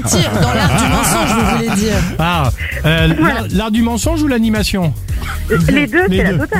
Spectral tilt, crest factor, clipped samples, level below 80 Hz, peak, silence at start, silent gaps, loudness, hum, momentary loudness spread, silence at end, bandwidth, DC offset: -5 dB/octave; 12 dB; under 0.1%; -24 dBFS; 0 dBFS; 0 s; none; -14 LUFS; none; 5 LU; 0 s; 16.5 kHz; under 0.1%